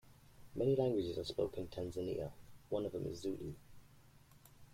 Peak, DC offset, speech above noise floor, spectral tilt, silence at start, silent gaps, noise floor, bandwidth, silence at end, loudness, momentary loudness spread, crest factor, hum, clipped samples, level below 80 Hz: -22 dBFS; under 0.1%; 24 dB; -7 dB/octave; 0.05 s; none; -63 dBFS; 16.5 kHz; 0 s; -40 LUFS; 14 LU; 18 dB; none; under 0.1%; -64 dBFS